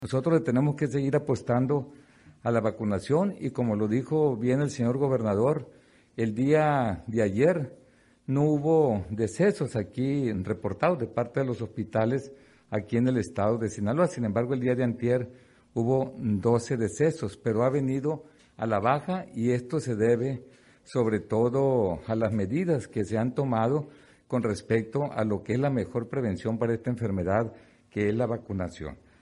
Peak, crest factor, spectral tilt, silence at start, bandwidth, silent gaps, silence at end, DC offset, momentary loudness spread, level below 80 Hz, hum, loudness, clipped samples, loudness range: -8 dBFS; 18 dB; -8 dB/octave; 0 s; 11.5 kHz; none; 0.25 s; under 0.1%; 8 LU; -60 dBFS; none; -27 LUFS; under 0.1%; 3 LU